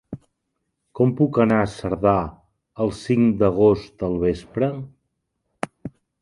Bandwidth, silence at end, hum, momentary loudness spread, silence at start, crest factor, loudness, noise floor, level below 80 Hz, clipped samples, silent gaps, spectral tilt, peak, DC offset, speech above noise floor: 11.5 kHz; 0.3 s; none; 19 LU; 0.1 s; 20 dB; -21 LUFS; -76 dBFS; -46 dBFS; under 0.1%; none; -8 dB/octave; -2 dBFS; under 0.1%; 57 dB